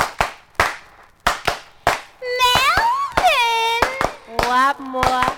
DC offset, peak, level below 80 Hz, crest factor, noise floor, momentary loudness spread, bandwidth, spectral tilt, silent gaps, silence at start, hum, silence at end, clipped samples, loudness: under 0.1%; -2 dBFS; -38 dBFS; 18 dB; -45 dBFS; 9 LU; over 20 kHz; -2.5 dB/octave; none; 0 s; none; 0 s; under 0.1%; -18 LUFS